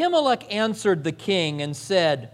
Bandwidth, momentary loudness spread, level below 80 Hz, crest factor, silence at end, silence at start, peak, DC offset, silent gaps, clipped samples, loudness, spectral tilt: 14 kHz; 4 LU; -68 dBFS; 16 dB; 0.05 s; 0 s; -6 dBFS; under 0.1%; none; under 0.1%; -23 LUFS; -4.5 dB/octave